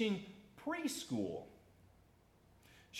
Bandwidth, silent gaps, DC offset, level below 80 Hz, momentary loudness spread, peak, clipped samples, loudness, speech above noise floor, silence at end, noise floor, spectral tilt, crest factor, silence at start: 16 kHz; none; under 0.1%; -74 dBFS; 21 LU; -26 dBFS; under 0.1%; -42 LUFS; 29 dB; 0 s; -68 dBFS; -4.5 dB/octave; 18 dB; 0 s